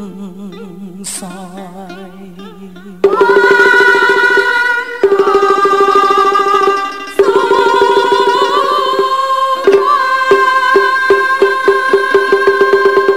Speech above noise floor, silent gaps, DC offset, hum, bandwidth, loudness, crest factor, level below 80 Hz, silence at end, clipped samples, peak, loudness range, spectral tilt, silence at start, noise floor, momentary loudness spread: 6 dB; none; 1%; none; 15 kHz; -10 LUFS; 10 dB; -52 dBFS; 0 s; 0.6%; 0 dBFS; 3 LU; -3.5 dB/octave; 0 s; -31 dBFS; 20 LU